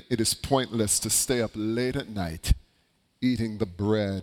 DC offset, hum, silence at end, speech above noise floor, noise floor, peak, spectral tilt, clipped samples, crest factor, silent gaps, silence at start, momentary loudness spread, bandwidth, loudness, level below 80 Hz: under 0.1%; none; 0 s; 42 dB; -68 dBFS; -8 dBFS; -4 dB/octave; under 0.1%; 18 dB; none; 0.1 s; 8 LU; 18 kHz; -27 LUFS; -36 dBFS